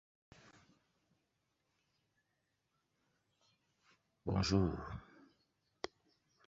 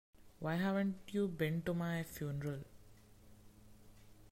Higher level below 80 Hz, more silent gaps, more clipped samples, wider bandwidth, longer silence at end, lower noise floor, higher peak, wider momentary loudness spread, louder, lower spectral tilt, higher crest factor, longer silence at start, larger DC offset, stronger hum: first, -58 dBFS vs -66 dBFS; neither; neither; second, 7.6 kHz vs 16 kHz; first, 1.45 s vs 0 s; first, -84 dBFS vs -61 dBFS; first, -20 dBFS vs -24 dBFS; first, 16 LU vs 9 LU; about the same, -39 LUFS vs -39 LUFS; about the same, -6 dB/octave vs -7 dB/octave; first, 24 dB vs 16 dB; first, 4.25 s vs 0.2 s; neither; neither